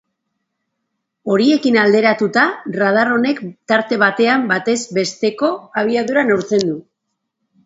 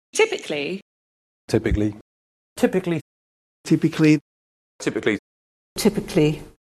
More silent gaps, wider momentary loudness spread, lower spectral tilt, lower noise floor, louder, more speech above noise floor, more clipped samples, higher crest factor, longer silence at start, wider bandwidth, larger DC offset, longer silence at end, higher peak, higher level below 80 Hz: second, none vs 0.82-1.48 s, 2.01-2.56 s, 3.01-3.64 s, 4.21-4.79 s, 5.19-5.76 s; second, 7 LU vs 11 LU; about the same, -4.5 dB/octave vs -5.5 dB/octave; second, -75 dBFS vs under -90 dBFS; first, -16 LUFS vs -22 LUFS; second, 60 dB vs over 70 dB; neither; about the same, 16 dB vs 20 dB; first, 1.25 s vs 0.15 s; second, 8 kHz vs 13 kHz; neither; first, 0.85 s vs 0.15 s; first, 0 dBFS vs -4 dBFS; second, -66 dBFS vs -42 dBFS